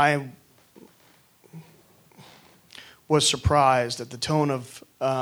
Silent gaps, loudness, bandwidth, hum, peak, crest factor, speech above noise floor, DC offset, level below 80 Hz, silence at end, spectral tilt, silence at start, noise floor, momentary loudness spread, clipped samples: none; -23 LUFS; over 20 kHz; none; -6 dBFS; 22 dB; 36 dB; under 0.1%; -46 dBFS; 0 s; -4 dB/octave; 0 s; -59 dBFS; 24 LU; under 0.1%